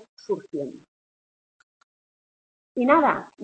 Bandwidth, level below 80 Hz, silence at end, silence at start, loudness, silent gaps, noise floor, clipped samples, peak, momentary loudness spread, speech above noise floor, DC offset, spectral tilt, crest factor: 8.6 kHz; -66 dBFS; 0 s; 0.3 s; -23 LUFS; 0.88-2.75 s; under -90 dBFS; under 0.1%; -4 dBFS; 16 LU; over 67 dB; under 0.1%; -6.5 dB/octave; 24 dB